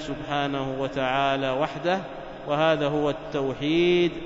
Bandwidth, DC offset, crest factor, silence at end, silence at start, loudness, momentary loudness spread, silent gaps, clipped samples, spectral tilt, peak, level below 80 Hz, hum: 7.8 kHz; under 0.1%; 16 dB; 0 s; 0 s; -25 LUFS; 8 LU; none; under 0.1%; -6 dB/octave; -8 dBFS; -50 dBFS; none